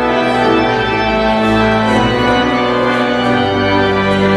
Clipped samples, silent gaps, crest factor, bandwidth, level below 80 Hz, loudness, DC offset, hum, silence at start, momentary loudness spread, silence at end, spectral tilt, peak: under 0.1%; none; 12 dB; 12 kHz; -32 dBFS; -12 LUFS; under 0.1%; none; 0 s; 1 LU; 0 s; -6 dB/octave; 0 dBFS